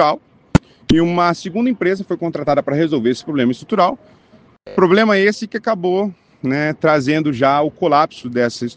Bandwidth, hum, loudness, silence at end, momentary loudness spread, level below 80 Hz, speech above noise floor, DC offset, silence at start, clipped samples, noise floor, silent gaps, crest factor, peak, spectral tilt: 9.4 kHz; none; -17 LUFS; 0.05 s; 7 LU; -40 dBFS; 33 dB; under 0.1%; 0 s; under 0.1%; -49 dBFS; none; 16 dB; 0 dBFS; -6.5 dB/octave